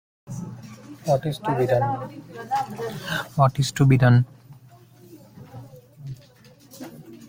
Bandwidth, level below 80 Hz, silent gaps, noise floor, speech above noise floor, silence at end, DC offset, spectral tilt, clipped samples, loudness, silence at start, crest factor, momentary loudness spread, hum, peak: 16.5 kHz; -54 dBFS; none; -51 dBFS; 30 dB; 0 s; under 0.1%; -6.5 dB/octave; under 0.1%; -22 LUFS; 0.3 s; 20 dB; 24 LU; none; -4 dBFS